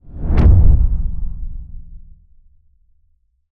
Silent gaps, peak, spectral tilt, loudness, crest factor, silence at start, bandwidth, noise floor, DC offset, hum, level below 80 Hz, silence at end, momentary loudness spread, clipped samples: none; 0 dBFS; -11 dB/octave; -16 LUFS; 14 dB; 0.1 s; 3.5 kHz; -59 dBFS; under 0.1%; none; -18 dBFS; 1.55 s; 23 LU; under 0.1%